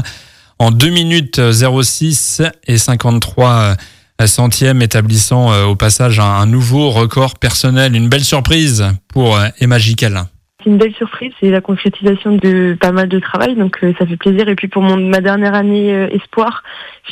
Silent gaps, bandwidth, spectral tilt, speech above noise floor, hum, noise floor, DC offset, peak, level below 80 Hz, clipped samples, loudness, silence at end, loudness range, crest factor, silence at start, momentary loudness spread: none; 16 kHz; -5 dB/octave; 27 dB; none; -38 dBFS; under 0.1%; 0 dBFS; -36 dBFS; under 0.1%; -11 LUFS; 0 s; 2 LU; 10 dB; 0 s; 6 LU